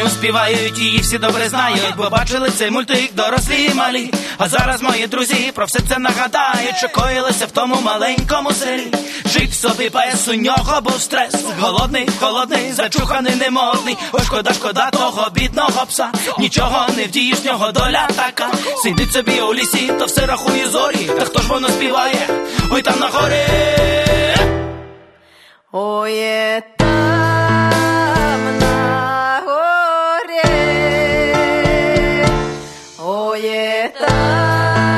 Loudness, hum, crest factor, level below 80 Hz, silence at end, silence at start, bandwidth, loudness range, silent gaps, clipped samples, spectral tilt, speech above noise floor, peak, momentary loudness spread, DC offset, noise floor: -15 LUFS; none; 16 dB; -30 dBFS; 0 s; 0 s; 13.5 kHz; 2 LU; none; under 0.1%; -3.5 dB/octave; 31 dB; 0 dBFS; 4 LU; under 0.1%; -47 dBFS